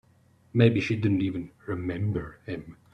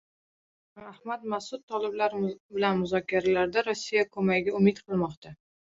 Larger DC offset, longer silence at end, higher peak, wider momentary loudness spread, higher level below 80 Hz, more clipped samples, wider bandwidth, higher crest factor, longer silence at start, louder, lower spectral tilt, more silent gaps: neither; second, 0.2 s vs 0.45 s; first, -6 dBFS vs -10 dBFS; first, 16 LU vs 11 LU; first, -56 dBFS vs -64 dBFS; neither; second, 6.8 kHz vs 7.8 kHz; about the same, 20 dB vs 18 dB; second, 0.55 s vs 0.75 s; about the same, -27 LUFS vs -28 LUFS; first, -8 dB/octave vs -6 dB/octave; second, none vs 1.63-1.68 s, 2.40-2.49 s, 5.17-5.22 s